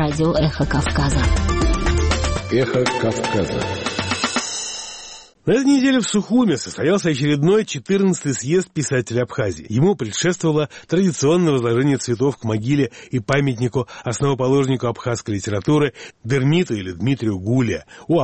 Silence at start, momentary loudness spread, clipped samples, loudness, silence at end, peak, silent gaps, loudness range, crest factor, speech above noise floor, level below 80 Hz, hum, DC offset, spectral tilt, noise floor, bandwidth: 0 s; 7 LU; under 0.1%; -19 LUFS; 0 s; -2 dBFS; none; 2 LU; 18 dB; 21 dB; -30 dBFS; none; under 0.1%; -5.5 dB/octave; -39 dBFS; 8.8 kHz